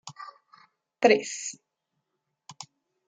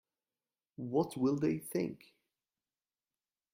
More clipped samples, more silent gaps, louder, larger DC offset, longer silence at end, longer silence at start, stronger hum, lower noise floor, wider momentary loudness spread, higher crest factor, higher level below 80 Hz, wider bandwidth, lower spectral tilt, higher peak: neither; neither; first, -25 LUFS vs -35 LUFS; neither; second, 0.45 s vs 1.6 s; second, 0.05 s vs 0.8 s; neither; second, -81 dBFS vs under -90 dBFS; first, 24 LU vs 12 LU; first, 26 dB vs 20 dB; second, -82 dBFS vs -74 dBFS; second, 9.6 kHz vs 16 kHz; second, -2.5 dB/octave vs -7 dB/octave; first, -6 dBFS vs -18 dBFS